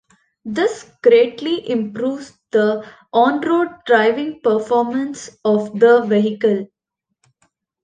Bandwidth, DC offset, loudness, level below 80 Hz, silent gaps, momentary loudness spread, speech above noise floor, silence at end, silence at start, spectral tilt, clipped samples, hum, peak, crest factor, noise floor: 9.2 kHz; under 0.1%; -17 LUFS; -64 dBFS; none; 11 LU; 61 dB; 1.2 s; 0.45 s; -5.5 dB/octave; under 0.1%; none; -2 dBFS; 16 dB; -78 dBFS